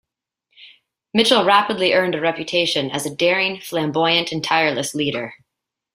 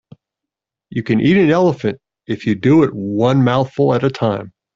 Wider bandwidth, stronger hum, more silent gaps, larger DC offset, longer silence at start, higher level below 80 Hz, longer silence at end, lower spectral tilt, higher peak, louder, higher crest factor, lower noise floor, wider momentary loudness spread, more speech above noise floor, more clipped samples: first, 16 kHz vs 7.4 kHz; neither; neither; neither; second, 0.6 s vs 0.9 s; second, -62 dBFS vs -52 dBFS; first, 0.6 s vs 0.25 s; second, -3.5 dB/octave vs -8 dB/octave; about the same, -2 dBFS vs -2 dBFS; about the same, -18 LUFS vs -16 LUFS; first, 20 dB vs 14 dB; about the same, -82 dBFS vs -84 dBFS; second, 8 LU vs 13 LU; second, 63 dB vs 70 dB; neither